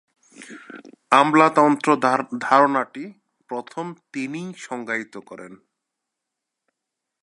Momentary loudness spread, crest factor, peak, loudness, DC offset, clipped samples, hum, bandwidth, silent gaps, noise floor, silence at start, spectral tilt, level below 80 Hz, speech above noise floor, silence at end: 24 LU; 22 dB; 0 dBFS; -19 LUFS; under 0.1%; under 0.1%; none; 11.5 kHz; none; -83 dBFS; 0.4 s; -5 dB/octave; -78 dBFS; 62 dB; 1.65 s